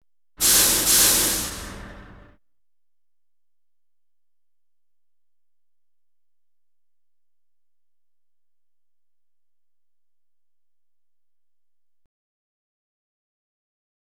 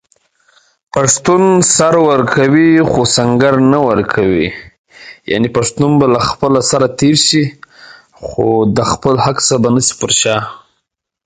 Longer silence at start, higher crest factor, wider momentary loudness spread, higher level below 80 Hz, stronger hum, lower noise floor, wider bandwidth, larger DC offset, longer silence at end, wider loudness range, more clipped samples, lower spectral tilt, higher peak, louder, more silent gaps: second, 0.4 s vs 0.95 s; first, 26 dB vs 12 dB; first, 18 LU vs 9 LU; second, -50 dBFS vs -42 dBFS; neither; first, under -90 dBFS vs -70 dBFS; first, over 20 kHz vs 9.6 kHz; first, 0.1% vs under 0.1%; first, 12 s vs 0.7 s; first, 17 LU vs 3 LU; neither; second, 0 dB/octave vs -4 dB/octave; second, -4 dBFS vs 0 dBFS; second, -16 LUFS vs -11 LUFS; second, none vs 4.78-4.84 s